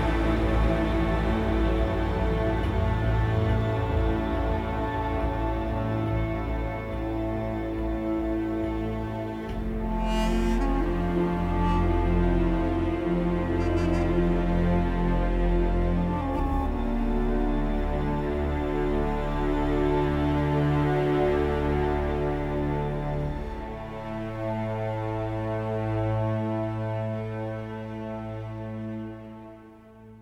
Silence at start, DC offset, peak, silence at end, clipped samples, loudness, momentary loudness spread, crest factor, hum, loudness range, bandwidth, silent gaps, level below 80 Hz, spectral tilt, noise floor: 0 s; under 0.1%; -12 dBFS; 0 s; under 0.1%; -27 LUFS; 8 LU; 14 dB; none; 5 LU; 9.2 kHz; none; -30 dBFS; -8.5 dB/octave; -48 dBFS